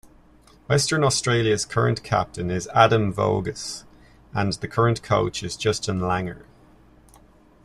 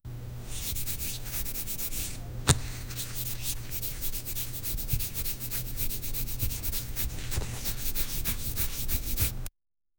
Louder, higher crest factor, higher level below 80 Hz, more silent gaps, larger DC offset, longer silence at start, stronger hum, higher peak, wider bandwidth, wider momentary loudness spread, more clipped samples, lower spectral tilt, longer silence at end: first, -23 LUFS vs -32 LUFS; second, 22 dB vs 32 dB; second, -50 dBFS vs -36 dBFS; neither; neither; first, 0.7 s vs 0.05 s; neither; about the same, -2 dBFS vs 0 dBFS; second, 13 kHz vs 19 kHz; first, 12 LU vs 6 LU; neither; first, -4.5 dB/octave vs -3 dB/octave; first, 1.25 s vs 0.5 s